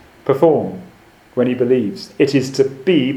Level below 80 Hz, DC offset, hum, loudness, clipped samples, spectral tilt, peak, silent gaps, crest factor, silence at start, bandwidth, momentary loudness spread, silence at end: -58 dBFS; under 0.1%; none; -17 LUFS; under 0.1%; -6.5 dB/octave; 0 dBFS; none; 16 dB; 0.25 s; 14.5 kHz; 12 LU; 0 s